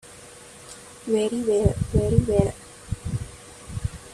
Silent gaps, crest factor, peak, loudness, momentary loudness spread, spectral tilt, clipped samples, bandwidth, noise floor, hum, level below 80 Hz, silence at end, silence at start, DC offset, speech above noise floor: none; 22 dB; -4 dBFS; -24 LUFS; 21 LU; -7 dB/octave; under 0.1%; 13.5 kHz; -45 dBFS; none; -36 dBFS; 0 s; 0.05 s; under 0.1%; 24 dB